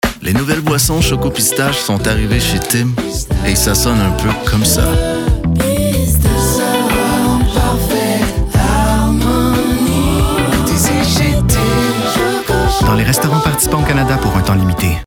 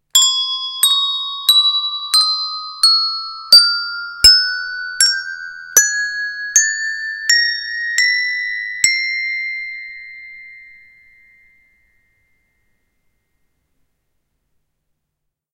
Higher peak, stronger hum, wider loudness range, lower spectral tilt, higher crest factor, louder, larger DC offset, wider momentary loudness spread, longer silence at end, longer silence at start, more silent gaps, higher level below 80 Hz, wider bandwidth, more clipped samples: about the same, -2 dBFS vs 0 dBFS; neither; second, 1 LU vs 10 LU; first, -4.5 dB/octave vs 3.5 dB/octave; second, 10 dB vs 18 dB; about the same, -13 LUFS vs -13 LUFS; neither; second, 3 LU vs 16 LU; second, 0 s vs 4.9 s; about the same, 0.05 s vs 0.15 s; neither; first, -20 dBFS vs -50 dBFS; first, 20 kHz vs 16 kHz; neither